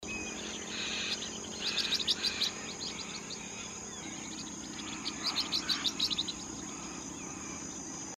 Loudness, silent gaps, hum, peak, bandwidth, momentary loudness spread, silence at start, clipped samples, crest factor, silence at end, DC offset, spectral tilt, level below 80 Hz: -35 LUFS; none; none; -16 dBFS; 16 kHz; 11 LU; 0 s; under 0.1%; 22 dB; 0.05 s; under 0.1%; -1 dB/octave; -62 dBFS